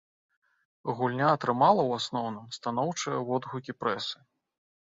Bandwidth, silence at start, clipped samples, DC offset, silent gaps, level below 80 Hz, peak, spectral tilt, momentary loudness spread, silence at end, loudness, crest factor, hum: 8 kHz; 0.85 s; under 0.1%; under 0.1%; none; -72 dBFS; -8 dBFS; -5 dB/octave; 13 LU; 0.7 s; -29 LUFS; 22 dB; none